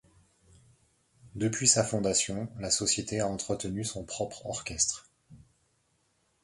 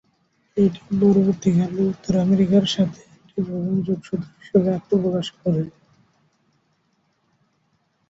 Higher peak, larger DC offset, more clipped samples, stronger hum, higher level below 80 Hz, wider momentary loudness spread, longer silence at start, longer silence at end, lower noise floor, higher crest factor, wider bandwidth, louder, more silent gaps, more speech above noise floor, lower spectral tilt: second, -8 dBFS vs -4 dBFS; neither; neither; neither; about the same, -58 dBFS vs -56 dBFS; about the same, 13 LU vs 11 LU; first, 1.25 s vs 0.55 s; second, 1.05 s vs 2.4 s; first, -73 dBFS vs -67 dBFS; first, 24 dB vs 18 dB; first, 11.5 kHz vs 7.8 kHz; second, -29 LUFS vs -21 LUFS; neither; second, 42 dB vs 47 dB; second, -3 dB/octave vs -7.5 dB/octave